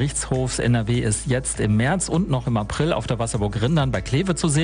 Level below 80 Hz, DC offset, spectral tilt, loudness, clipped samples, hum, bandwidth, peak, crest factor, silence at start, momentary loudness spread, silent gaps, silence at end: -36 dBFS; under 0.1%; -5 dB/octave; -22 LUFS; under 0.1%; none; 10 kHz; -8 dBFS; 14 dB; 0 s; 3 LU; none; 0 s